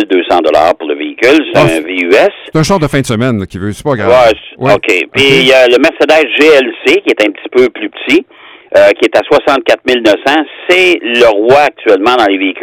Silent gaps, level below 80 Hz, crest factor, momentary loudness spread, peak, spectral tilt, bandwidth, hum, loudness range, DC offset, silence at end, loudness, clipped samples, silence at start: none; -40 dBFS; 8 dB; 7 LU; 0 dBFS; -5 dB/octave; 18 kHz; none; 3 LU; under 0.1%; 0 s; -8 LUFS; 1%; 0 s